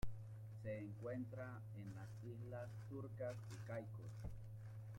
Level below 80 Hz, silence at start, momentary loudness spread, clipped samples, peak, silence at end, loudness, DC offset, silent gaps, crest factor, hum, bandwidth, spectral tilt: -64 dBFS; 0 s; 5 LU; under 0.1%; -32 dBFS; 0 s; -52 LUFS; under 0.1%; none; 18 dB; none; 16 kHz; -8 dB/octave